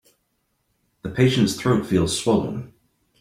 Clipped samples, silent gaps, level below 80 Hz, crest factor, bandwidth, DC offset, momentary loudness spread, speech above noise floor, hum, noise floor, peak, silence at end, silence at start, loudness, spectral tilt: under 0.1%; none; -50 dBFS; 18 dB; 15.5 kHz; under 0.1%; 14 LU; 51 dB; none; -71 dBFS; -4 dBFS; 0.55 s; 1.05 s; -21 LUFS; -5.5 dB/octave